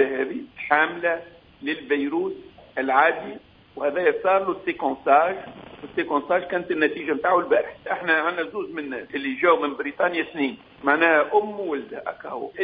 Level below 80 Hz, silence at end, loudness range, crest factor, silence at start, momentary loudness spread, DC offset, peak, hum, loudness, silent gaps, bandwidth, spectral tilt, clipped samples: -64 dBFS; 0 s; 2 LU; 22 dB; 0 s; 14 LU; under 0.1%; -2 dBFS; none; -23 LUFS; none; 5 kHz; -8 dB/octave; under 0.1%